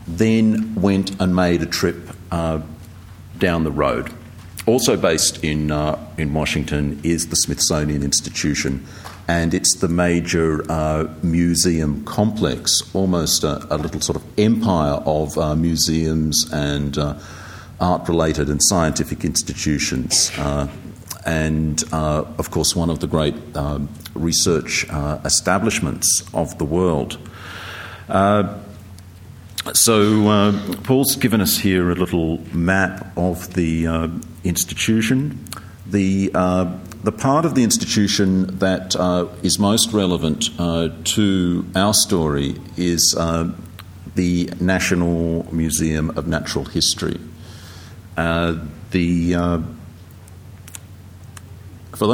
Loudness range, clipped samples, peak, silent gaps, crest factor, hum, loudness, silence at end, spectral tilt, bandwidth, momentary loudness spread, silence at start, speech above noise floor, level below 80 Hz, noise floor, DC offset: 4 LU; under 0.1%; 0 dBFS; none; 18 dB; none; -19 LUFS; 0 s; -4 dB/octave; 17 kHz; 14 LU; 0 s; 21 dB; -36 dBFS; -40 dBFS; under 0.1%